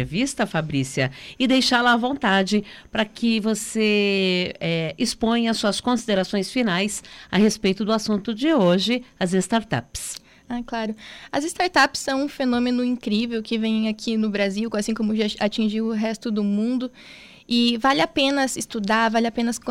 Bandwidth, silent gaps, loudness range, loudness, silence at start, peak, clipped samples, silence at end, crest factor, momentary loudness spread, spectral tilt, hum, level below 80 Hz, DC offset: 15.5 kHz; none; 3 LU; -22 LUFS; 0 s; -6 dBFS; under 0.1%; 0 s; 16 dB; 8 LU; -4.5 dB/octave; none; -52 dBFS; under 0.1%